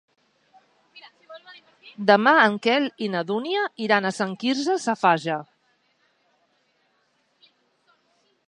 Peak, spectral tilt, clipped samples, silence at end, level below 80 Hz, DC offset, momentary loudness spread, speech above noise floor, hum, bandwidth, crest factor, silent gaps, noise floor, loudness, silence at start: -2 dBFS; -4.5 dB/octave; under 0.1%; 3.05 s; -80 dBFS; under 0.1%; 11 LU; 47 dB; none; 11 kHz; 24 dB; none; -68 dBFS; -22 LUFS; 0.95 s